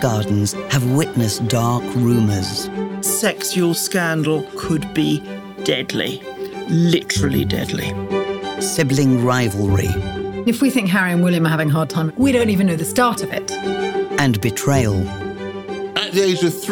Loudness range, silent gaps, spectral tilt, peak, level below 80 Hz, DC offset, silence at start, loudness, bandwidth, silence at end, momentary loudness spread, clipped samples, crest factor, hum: 3 LU; none; -5 dB/octave; -2 dBFS; -44 dBFS; under 0.1%; 0 s; -18 LUFS; 19.5 kHz; 0 s; 7 LU; under 0.1%; 16 dB; none